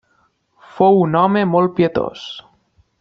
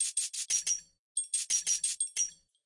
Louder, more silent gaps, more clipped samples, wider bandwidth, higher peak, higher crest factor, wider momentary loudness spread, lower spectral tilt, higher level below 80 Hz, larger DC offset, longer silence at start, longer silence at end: first, -15 LUFS vs -31 LUFS; second, none vs 0.99-1.15 s; neither; second, 6.8 kHz vs 12 kHz; first, 0 dBFS vs -18 dBFS; about the same, 18 dB vs 16 dB; first, 18 LU vs 6 LU; first, -8.5 dB/octave vs 5 dB/octave; first, -54 dBFS vs -78 dBFS; neither; first, 0.75 s vs 0 s; first, 0.6 s vs 0.3 s